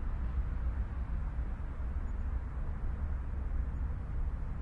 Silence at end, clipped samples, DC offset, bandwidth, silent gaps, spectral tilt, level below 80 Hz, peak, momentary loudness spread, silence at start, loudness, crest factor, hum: 0 s; under 0.1%; under 0.1%; 3.4 kHz; none; -9.5 dB/octave; -36 dBFS; -24 dBFS; 3 LU; 0 s; -39 LUFS; 10 dB; none